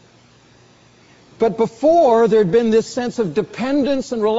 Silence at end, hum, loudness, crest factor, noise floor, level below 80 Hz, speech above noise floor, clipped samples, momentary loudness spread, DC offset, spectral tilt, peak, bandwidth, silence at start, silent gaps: 0 s; none; -17 LUFS; 14 dB; -50 dBFS; -52 dBFS; 34 dB; under 0.1%; 9 LU; under 0.1%; -5.5 dB/octave; -4 dBFS; 8 kHz; 1.4 s; none